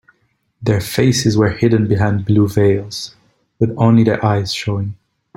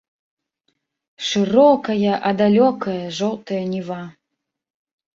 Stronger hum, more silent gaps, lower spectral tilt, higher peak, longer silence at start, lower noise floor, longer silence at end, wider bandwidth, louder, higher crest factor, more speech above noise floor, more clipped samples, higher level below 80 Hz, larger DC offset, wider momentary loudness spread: neither; neither; about the same, -6.5 dB/octave vs -6 dB/octave; about the same, -2 dBFS vs -2 dBFS; second, 0.6 s vs 1.2 s; second, -63 dBFS vs -80 dBFS; second, 0.45 s vs 1.05 s; first, 16.5 kHz vs 7.6 kHz; first, -15 LUFS vs -18 LUFS; about the same, 14 dB vs 18 dB; second, 49 dB vs 62 dB; neither; first, -44 dBFS vs -62 dBFS; neither; about the same, 11 LU vs 13 LU